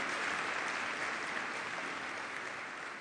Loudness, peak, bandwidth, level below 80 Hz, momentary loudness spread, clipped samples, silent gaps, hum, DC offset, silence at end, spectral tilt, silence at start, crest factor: -37 LUFS; -22 dBFS; 10 kHz; -76 dBFS; 6 LU; under 0.1%; none; none; under 0.1%; 0 s; -1.5 dB/octave; 0 s; 16 dB